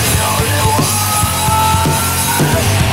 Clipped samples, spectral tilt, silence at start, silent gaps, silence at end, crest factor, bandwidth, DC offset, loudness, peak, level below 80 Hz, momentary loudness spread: under 0.1%; -3.5 dB/octave; 0 s; none; 0 s; 12 dB; 16.5 kHz; under 0.1%; -12 LUFS; -2 dBFS; -28 dBFS; 1 LU